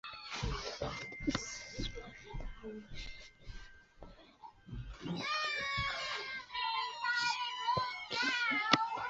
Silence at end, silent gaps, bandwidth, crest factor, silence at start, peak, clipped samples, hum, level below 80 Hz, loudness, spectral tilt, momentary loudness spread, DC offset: 0 s; none; 8 kHz; 30 dB; 0.05 s; -10 dBFS; under 0.1%; none; -52 dBFS; -36 LUFS; -1.5 dB/octave; 21 LU; under 0.1%